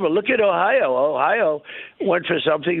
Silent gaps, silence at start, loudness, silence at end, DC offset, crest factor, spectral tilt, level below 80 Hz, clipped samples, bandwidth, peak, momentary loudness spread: none; 0 s; -19 LUFS; 0 s; under 0.1%; 14 dB; -9.5 dB/octave; -64 dBFS; under 0.1%; 4.1 kHz; -4 dBFS; 8 LU